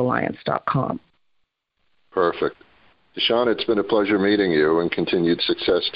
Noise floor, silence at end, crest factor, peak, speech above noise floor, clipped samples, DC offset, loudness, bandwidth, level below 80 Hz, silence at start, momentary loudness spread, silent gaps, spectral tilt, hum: -70 dBFS; 0.05 s; 16 dB; -6 dBFS; 49 dB; under 0.1%; under 0.1%; -21 LUFS; 5.4 kHz; -54 dBFS; 0 s; 9 LU; none; -10 dB/octave; none